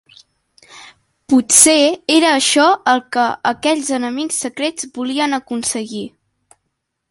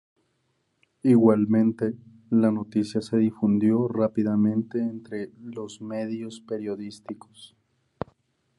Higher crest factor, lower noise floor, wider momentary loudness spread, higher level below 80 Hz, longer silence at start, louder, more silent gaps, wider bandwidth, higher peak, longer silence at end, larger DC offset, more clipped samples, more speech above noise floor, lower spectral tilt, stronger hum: about the same, 16 dB vs 18 dB; about the same, -73 dBFS vs -73 dBFS; second, 13 LU vs 19 LU; about the same, -60 dBFS vs -64 dBFS; second, 0.7 s vs 1.05 s; first, -14 LUFS vs -24 LUFS; neither; first, 16 kHz vs 11 kHz; first, 0 dBFS vs -6 dBFS; about the same, 1.05 s vs 1.1 s; neither; neither; first, 58 dB vs 48 dB; second, -1 dB/octave vs -8.5 dB/octave; neither